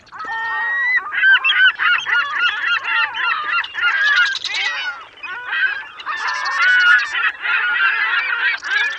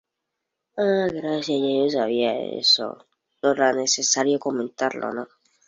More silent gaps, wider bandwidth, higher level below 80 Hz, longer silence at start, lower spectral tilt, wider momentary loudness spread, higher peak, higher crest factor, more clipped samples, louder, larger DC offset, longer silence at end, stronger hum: neither; about the same, 8.6 kHz vs 8 kHz; about the same, -64 dBFS vs -68 dBFS; second, 0.1 s vs 0.75 s; second, 1.5 dB/octave vs -2.5 dB/octave; about the same, 11 LU vs 12 LU; first, -2 dBFS vs -6 dBFS; about the same, 16 dB vs 18 dB; neither; first, -16 LUFS vs -22 LUFS; neither; second, 0 s vs 0.45 s; neither